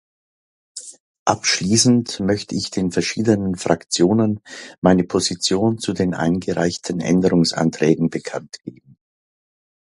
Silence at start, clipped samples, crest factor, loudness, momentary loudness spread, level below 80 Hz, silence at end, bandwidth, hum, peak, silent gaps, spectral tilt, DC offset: 0.75 s; under 0.1%; 20 dB; -19 LUFS; 18 LU; -48 dBFS; 1.2 s; 11.5 kHz; none; 0 dBFS; 1.00-1.26 s, 4.78-4.82 s; -4.5 dB/octave; under 0.1%